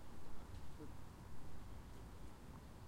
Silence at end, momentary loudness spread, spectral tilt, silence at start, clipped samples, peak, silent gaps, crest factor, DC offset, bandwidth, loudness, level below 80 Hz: 0 s; 2 LU; -6 dB/octave; 0 s; under 0.1%; -34 dBFS; none; 12 dB; under 0.1%; 16 kHz; -58 LUFS; -60 dBFS